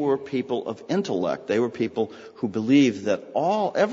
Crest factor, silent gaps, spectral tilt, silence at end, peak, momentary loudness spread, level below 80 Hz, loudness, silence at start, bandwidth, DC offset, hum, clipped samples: 16 dB; none; -6 dB/octave; 0 s; -8 dBFS; 10 LU; -68 dBFS; -24 LUFS; 0 s; 7.6 kHz; under 0.1%; none; under 0.1%